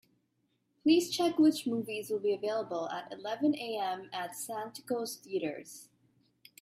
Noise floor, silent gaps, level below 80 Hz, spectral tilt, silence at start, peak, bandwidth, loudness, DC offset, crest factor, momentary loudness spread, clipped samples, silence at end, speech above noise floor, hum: -77 dBFS; none; -80 dBFS; -4 dB/octave; 0.85 s; -14 dBFS; 15.5 kHz; -33 LUFS; under 0.1%; 18 dB; 12 LU; under 0.1%; 0.75 s; 45 dB; none